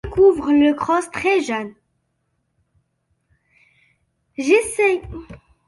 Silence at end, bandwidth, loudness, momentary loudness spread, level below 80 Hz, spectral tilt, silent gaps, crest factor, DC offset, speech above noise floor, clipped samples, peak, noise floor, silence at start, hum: 0.3 s; 11.5 kHz; -18 LUFS; 20 LU; -46 dBFS; -4.5 dB/octave; none; 18 dB; under 0.1%; 53 dB; under 0.1%; -4 dBFS; -71 dBFS; 0.05 s; none